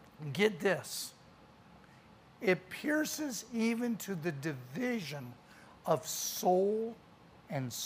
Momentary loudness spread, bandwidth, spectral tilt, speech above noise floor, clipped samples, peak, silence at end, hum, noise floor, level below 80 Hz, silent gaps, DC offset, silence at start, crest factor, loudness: 13 LU; 15.5 kHz; -4 dB/octave; 25 dB; under 0.1%; -16 dBFS; 0 s; none; -59 dBFS; -74 dBFS; none; under 0.1%; 0 s; 20 dB; -35 LUFS